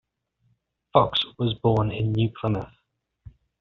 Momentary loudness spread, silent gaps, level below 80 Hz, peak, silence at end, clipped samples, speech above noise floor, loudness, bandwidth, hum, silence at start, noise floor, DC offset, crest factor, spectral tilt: 7 LU; none; -50 dBFS; -4 dBFS; 0.3 s; under 0.1%; 46 dB; -24 LUFS; 5.6 kHz; none; 0.95 s; -69 dBFS; under 0.1%; 22 dB; -5.5 dB/octave